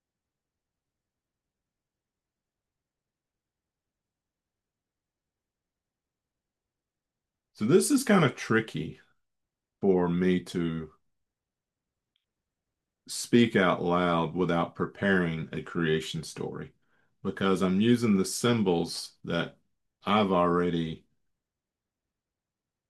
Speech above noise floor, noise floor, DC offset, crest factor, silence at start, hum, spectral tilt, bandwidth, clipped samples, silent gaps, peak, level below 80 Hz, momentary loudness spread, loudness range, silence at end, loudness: 63 dB; -90 dBFS; under 0.1%; 22 dB; 7.6 s; none; -5.5 dB/octave; 12.5 kHz; under 0.1%; none; -8 dBFS; -66 dBFS; 14 LU; 5 LU; 1.9 s; -27 LUFS